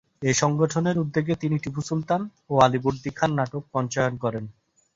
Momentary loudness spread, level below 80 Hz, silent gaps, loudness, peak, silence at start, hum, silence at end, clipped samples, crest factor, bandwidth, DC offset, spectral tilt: 8 LU; -56 dBFS; none; -24 LUFS; -4 dBFS; 0.2 s; none; 0.45 s; under 0.1%; 22 dB; 7.8 kHz; under 0.1%; -5.5 dB/octave